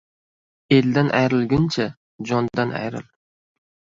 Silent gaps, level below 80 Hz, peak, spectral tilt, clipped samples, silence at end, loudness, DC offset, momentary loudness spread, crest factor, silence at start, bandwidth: 1.97-2.19 s; -52 dBFS; -2 dBFS; -7 dB/octave; under 0.1%; 0.95 s; -21 LUFS; under 0.1%; 12 LU; 20 dB; 0.7 s; 7.6 kHz